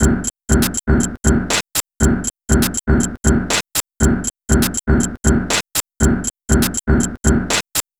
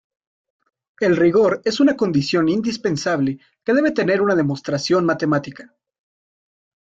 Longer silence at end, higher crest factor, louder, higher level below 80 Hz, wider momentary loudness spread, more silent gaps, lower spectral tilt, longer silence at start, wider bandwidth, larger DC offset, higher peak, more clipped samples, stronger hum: second, 0.2 s vs 1.35 s; about the same, 16 dB vs 14 dB; about the same, -17 LUFS vs -19 LUFS; first, -22 dBFS vs -58 dBFS; second, 2 LU vs 7 LU; neither; second, -4 dB/octave vs -6 dB/octave; second, 0 s vs 1 s; first, over 20 kHz vs 7.8 kHz; first, 0.4% vs under 0.1%; first, 0 dBFS vs -6 dBFS; neither; neither